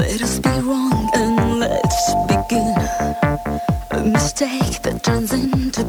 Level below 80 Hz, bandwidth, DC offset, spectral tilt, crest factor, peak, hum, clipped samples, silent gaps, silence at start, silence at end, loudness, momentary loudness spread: -30 dBFS; over 20 kHz; under 0.1%; -5 dB/octave; 18 dB; 0 dBFS; none; under 0.1%; none; 0 s; 0 s; -18 LUFS; 4 LU